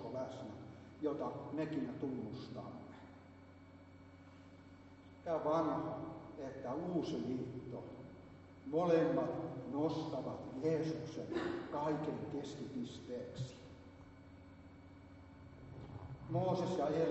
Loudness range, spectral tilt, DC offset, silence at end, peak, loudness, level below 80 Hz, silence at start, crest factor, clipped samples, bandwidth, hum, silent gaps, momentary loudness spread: 11 LU; -6.5 dB/octave; under 0.1%; 0 s; -22 dBFS; -41 LUFS; -70 dBFS; 0 s; 20 dB; under 0.1%; 8 kHz; none; none; 22 LU